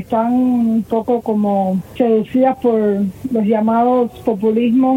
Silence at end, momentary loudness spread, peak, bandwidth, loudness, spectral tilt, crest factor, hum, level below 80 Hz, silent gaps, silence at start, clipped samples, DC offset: 0 s; 4 LU; -4 dBFS; 15.5 kHz; -16 LUFS; -9 dB/octave; 12 dB; none; -50 dBFS; none; 0 s; under 0.1%; under 0.1%